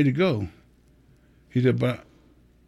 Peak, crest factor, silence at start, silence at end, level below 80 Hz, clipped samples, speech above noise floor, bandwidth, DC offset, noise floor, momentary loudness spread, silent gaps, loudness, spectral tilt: -10 dBFS; 18 dB; 0 s; 0.65 s; -56 dBFS; under 0.1%; 35 dB; 12 kHz; under 0.1%; -57 dBFS; 13 LU; none; -25 LUFS; -8.5 dB/octave